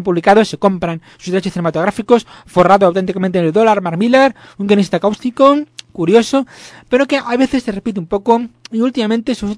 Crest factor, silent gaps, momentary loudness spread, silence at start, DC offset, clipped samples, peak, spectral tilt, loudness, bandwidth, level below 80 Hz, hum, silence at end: 14 dB; none; 9 LU; 0 s; under 0.1%; 0.3%; 0 dBFS; -6 dB/octave; -14 LUFS; 11 kHz; -48 dBFS; none; 0 s